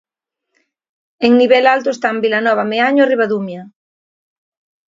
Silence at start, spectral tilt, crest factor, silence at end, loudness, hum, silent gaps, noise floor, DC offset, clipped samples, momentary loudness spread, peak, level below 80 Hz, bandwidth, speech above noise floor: 1.2 s; -5.5 dB/octave; 16 dB; 1.2 s; -13 LUFS; none; none; -77 dBFS; under 0.1%; under 0.1%; 9 LU; 0 dBFS; -66 dBFS; 7.6 kHz; 63 dB